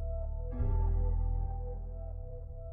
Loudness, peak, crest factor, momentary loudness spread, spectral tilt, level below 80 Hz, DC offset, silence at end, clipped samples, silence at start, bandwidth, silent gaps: -37 LUFS; -22 dBFS; 12 dB; 12 LU; -12.5 dB/octave; -34 dBFS; under 0.1%; 0 s; under 0.1%; 0 s; 2.1 kHz; none